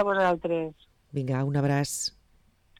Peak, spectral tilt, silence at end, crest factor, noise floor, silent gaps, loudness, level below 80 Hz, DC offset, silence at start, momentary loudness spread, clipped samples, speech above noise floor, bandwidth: -16 dBFS; -5 dB/octave; 0.7 s; 14 dB; -63 dBFS; none; -28 LUFS; -60 dBFS; under 0.1%; 0 s; 10 LU; under 0.1%; 36 dB; 15.5 kHz